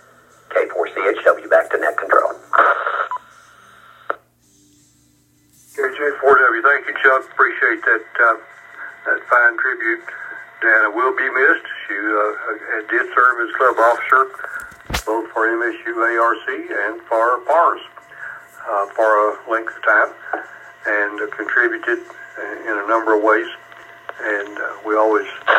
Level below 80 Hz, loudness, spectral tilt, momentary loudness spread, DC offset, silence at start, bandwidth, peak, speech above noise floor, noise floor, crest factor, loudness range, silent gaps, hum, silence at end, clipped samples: -50 dBFS; -17 LUFS; -4 dB/octave; 15 LU; under 0.1%; 0.5 s; 16 kHz; 0 dBFS; 39 dB; -56 dBFS; 18 dB; 4 LU; none; none; 0 s; under 0.1%